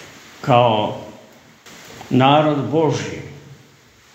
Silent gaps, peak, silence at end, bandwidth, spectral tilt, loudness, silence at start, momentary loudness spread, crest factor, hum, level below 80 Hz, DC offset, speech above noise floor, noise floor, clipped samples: none; 0 dBFS; 0.6 s; 16 kHz; -6.5 dB/octave; -17 LUFS; 0 s; 24 LU; 20 dB; none; -60 dBFS; under 0.1%; 34 dB; -50 dBFS; under 0.1%